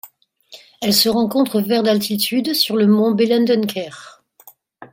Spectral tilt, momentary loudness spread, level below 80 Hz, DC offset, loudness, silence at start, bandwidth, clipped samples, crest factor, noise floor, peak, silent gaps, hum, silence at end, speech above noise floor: -4.5 dB/octave; 8 LU; -62 dBFS; under 0.1%; -16 LUFS; 0.05 s; 17 kHz; under 0.1%; 16 dB; -49 dBFS; -2 dBFS; none; none; 0.05 s; 32 dB